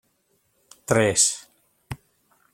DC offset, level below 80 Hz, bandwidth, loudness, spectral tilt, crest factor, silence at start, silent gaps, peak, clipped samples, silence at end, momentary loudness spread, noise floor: under 0.1%; -56 dBFS; 16.5 kHz; -20 LUFS; -3 dB/octave; 24 dB; 0.9 s; none; -4 dBFS; under 0.1%; 0.6 s; 22 LU; -68 dBFS